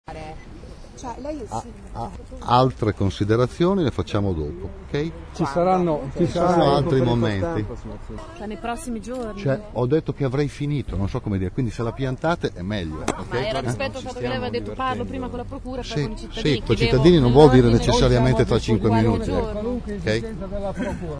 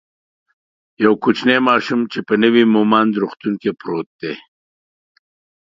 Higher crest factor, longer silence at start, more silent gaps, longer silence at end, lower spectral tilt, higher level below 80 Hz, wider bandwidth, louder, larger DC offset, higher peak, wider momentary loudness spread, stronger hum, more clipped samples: about the same, 22 dB vs 18 dB; second, 0.1 s vs 1 s; second, none vs 4.06-4.19 s; second, 0 s vs 1.2 s; about the same, -7 dB/octave vs -6.5 dB/octave; first, -34 dBFS vs -64 dBFS; first, 11 kHz vs 7.6 kHz; second, -22 LUFS vs -16 LUFS; neither; about the same, 0 dBFS vs 0 dBFS; first, 16 LU vs 13 LU; neither; neither